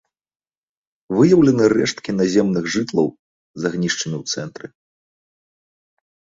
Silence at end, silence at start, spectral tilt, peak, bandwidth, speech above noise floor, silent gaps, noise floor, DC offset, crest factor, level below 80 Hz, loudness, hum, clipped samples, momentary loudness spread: 1.9 s; 1.1 s; -5.5 dB/octave; -2 dBFS; 7.8 kHz; over 72 dB; 3.19-3.54 s; under -90 dBFS; under 0.1%; 18 dB; -56 dBFS; -18 LUFS; none; under 0.1%; 13 LU